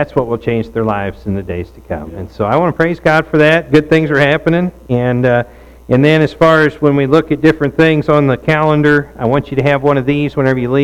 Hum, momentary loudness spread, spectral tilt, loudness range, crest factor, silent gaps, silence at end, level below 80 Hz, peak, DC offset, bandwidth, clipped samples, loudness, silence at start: none; 10 LU; -7.5 dB/octave; 3 LU; 12 dB; none; 0 s; -38 dBFS; 0 dBFS; under 0.1%; 12.5 kHz; under 0.1%; -12 LUFS; 0 s